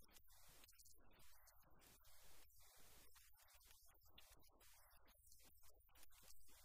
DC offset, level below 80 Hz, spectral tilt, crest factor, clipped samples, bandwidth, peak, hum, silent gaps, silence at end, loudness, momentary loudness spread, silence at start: under 0.1%; -76 dBFS; -1.5 dB/octave; 18 dB; under 0.1%; 15.5 kHz; -48 dBFS; none; none; 0 s; -69 LUFS; 2 LU; 0 s